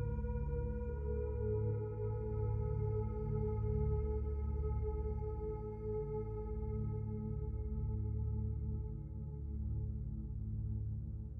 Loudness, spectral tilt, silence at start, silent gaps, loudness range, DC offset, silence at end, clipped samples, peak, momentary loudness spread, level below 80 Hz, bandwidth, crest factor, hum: -41 LUFS; -13 dB/octave; 0 s; none; 3 LU; under 0.1%; 0 s; under 0.1%; -26 dBFS; 6 LU; -42 dBFS; 2.6 kHz; 12 dB; none